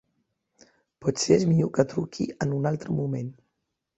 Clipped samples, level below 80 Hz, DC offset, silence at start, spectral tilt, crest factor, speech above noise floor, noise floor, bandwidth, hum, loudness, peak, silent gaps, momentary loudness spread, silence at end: under 0.1%; -60 dBFS; under 0.1%; 1 s; -6 dB/octave; 22 dB; 55 dB; -80 dBFS; 8.2 kHz; none; -26 LUFS; -6 dBFS; none; 10 LU; 0.65 s